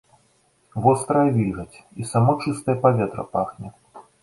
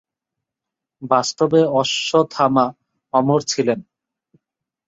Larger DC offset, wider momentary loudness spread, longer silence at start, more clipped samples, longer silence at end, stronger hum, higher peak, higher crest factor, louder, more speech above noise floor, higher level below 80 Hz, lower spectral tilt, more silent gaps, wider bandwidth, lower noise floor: neither; first, 16 LU vs 6 LU; second, 0.75 s vs 1 s; neither; second, 0.2 s vs 1.05 s; neither; about the same, -4 dBFS vs -2 dBFS; about the same, 18 dB vs 18 dB; second, -21 LUFS vs -18 LUFS; second, 41 dB vs 67 dB; first, -52 dBFS vs -64 dBFS; first, -7.5 dB/octave vs -4.5 dB/octave; neither; first, 11.5 kHz vs 7.8 kHz; second, -62 dBFS vs -85 dBFS